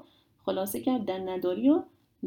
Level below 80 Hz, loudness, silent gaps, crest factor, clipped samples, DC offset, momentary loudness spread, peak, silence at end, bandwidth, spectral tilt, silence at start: -68 dBFS; -29 LUFS; none; 16 dB; under 0.1%; under 0.1%; 8 LU; -12 dBFS; 0 s; 19 kHz; -5.5 dB/octave; 0.45 s